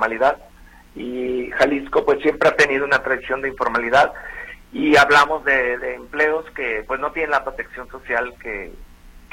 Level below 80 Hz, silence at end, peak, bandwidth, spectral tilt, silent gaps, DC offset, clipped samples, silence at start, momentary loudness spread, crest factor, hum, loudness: -44 dBFS; 0.1 s; -2 dBFS; 16.5 kHz; -4 dB/octave; none; under 0.1%; under 0.1%; 0 s; 17 LU; 18 dB; none; -19 LUFS